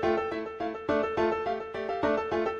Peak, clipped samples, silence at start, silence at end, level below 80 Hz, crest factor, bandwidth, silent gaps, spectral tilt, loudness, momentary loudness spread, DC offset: -14 dBFS; under 0.1%; 0 s; 0 s; -56 dBFS; 14 dB; 7.6 kHz; none; -6.5 dB/octave; -30 LUFS; 6 LU; under 0.1%